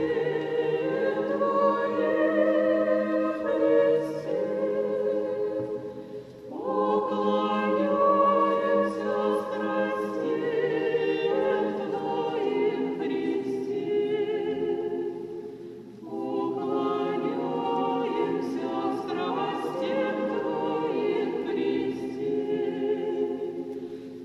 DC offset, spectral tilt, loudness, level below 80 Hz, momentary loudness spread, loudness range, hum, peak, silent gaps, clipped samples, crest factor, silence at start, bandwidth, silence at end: under 0.1%; -7 dB/octave; -27 LUFS; -70 dBFS; 9 LU; 5 LU; none; -10 dBFS; none; under 0.1%; 16 dB; 0 s; 11.5 kHz; 0 s